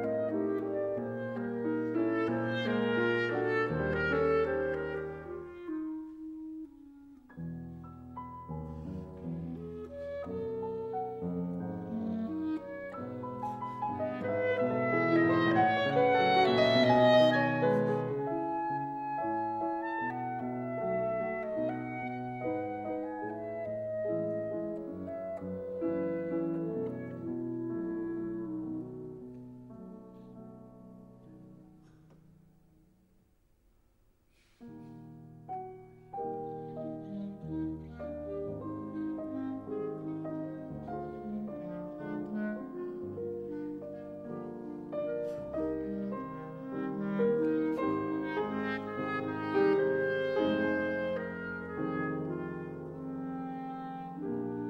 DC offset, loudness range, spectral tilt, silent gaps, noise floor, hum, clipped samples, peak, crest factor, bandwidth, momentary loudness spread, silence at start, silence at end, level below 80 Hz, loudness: under 0.1%; 16 LU; -7.5 dB/octave; none; -68 dBFS; none; under 0.1%; -14 dBFS; 20 dB; 7.8 kHz; 16 LU; 0 s; 0 s; -62 dBFS; -34 LUFS